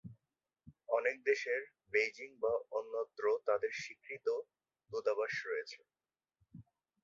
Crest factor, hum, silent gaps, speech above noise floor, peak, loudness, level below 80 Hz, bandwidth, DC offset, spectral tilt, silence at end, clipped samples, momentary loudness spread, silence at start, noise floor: 20 dB; none; none; over 53 dB; -18 dBFS; -37 LUFS; -78 dBFS; 7.6 kHz; under 0.1%; -1.5 dB/octave; 0.45 s; under 0.1%; 11 LU; 0.05 s; under -90 dBFS